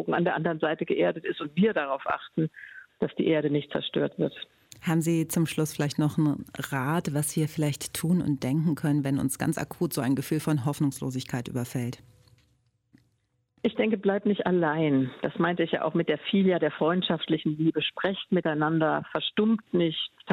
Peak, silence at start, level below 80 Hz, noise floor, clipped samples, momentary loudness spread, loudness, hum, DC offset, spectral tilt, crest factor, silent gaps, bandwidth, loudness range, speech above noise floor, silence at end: -10 dBFS; 0 s; -64 dBFS; -73 dBFS; under 0.1%; 7 LU; -27 LUFS; none; under 0.1%; -5.5 dB/octave; 18 dB; none; 16.5 kHz; 4 LU; 47 dB; 0 s